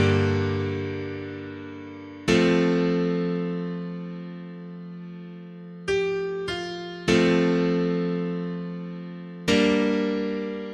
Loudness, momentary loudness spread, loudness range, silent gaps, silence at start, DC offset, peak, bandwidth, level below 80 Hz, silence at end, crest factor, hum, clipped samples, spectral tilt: -25 LUFS; 18 LU; 7 LU; none; 0 s; under 0.1%; -6 dBFS; 11 kHz; -54 dBFS; 0 s; 20 dB; none; under 0.1%; -6.5 dB/octave